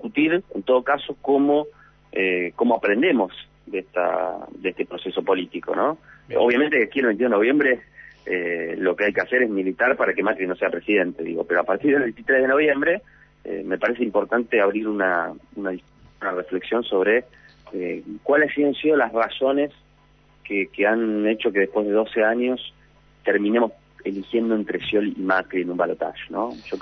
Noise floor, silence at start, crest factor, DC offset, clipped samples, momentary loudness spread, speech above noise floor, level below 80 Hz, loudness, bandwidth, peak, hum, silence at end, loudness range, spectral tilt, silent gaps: -56 dBFS; 0 s; 14 dB; under 0.1%; under 0.1%; 11 LU; 34 dB; -60 dBFS; -22 LUFS; 6.2 kHz; -8 dBFS; none; 0 s; 3 LU; -7.5 dB/octave; none